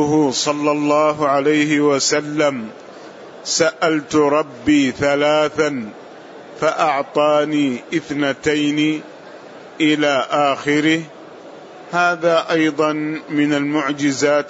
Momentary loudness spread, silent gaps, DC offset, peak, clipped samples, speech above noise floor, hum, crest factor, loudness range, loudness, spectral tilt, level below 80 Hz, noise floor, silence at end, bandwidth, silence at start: 22 LU; none; under 0.1%; -4 dBFS; under 0.1%; 21 dB; none; 14 dB; 2 LU; -17 LUFS; -4 dB/octave; -58 dBFS; -37 dBFS; 0 s; 8 kHz; 0 s